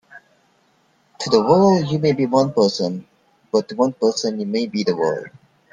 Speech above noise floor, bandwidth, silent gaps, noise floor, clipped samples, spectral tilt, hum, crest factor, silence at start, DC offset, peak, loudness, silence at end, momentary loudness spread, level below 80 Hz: 42 dB; 10 kHz; none; -60 dBFS; under 0.1%; -6 dB/octave; none; 20 dB; 0.15 s; under 0.1%; 0 dBFS; -19 LUFS; 0.45 s; 10 LU; -60 dBFS